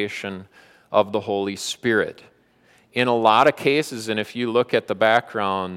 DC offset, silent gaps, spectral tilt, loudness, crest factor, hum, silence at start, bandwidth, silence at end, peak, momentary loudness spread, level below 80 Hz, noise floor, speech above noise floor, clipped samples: under 0.1%; none; -4.5 dB/octave; -21 LUFS; 18 dB; none; 0 s; 16 kHz; 0 s; -2 dBFS; 12 LU; -68 dBFS; -58 dBFS; 36 dB; under 0.1%